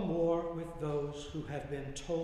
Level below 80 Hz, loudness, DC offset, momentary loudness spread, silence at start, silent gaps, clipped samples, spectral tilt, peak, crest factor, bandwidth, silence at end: -52 dBFS; -37 LUFS; under 0.1%; 9 LU; 0 s; none; under 0.1%; -6.5 dB/octave; -20 dBFS; 16 dB; 11.5 kHz; 0 s